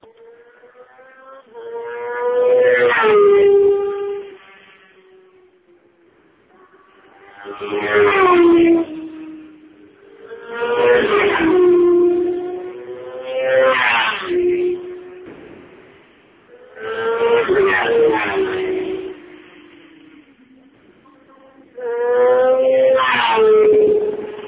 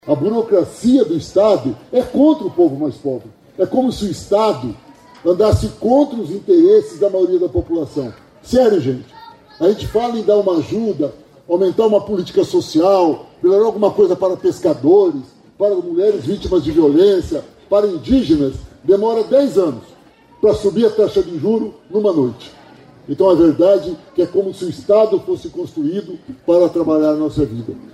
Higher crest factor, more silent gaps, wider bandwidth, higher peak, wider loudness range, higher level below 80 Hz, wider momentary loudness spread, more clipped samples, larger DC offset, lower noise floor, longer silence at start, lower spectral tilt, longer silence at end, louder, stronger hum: about the same, 16 dB vs 12 dB; neither; second, 4 kHz vs 12.5 kHz; about the same, -2 dBFS vs -2 dBFS; first, 9 LU vs 3 LU; second, -54 dBFS vs -42 dBFS; first, 20 LU vs 11 LU; neither; neither; first, -54 dBFS vs -43 dBFS; first, 1.3 s vs 0.05 s; about the same, -8.5 dB/octave vs -7.5 dB/octave; about the same, 0 s vs 0.1 s; about the same, -15 LUFS vs -16 LUFS; neither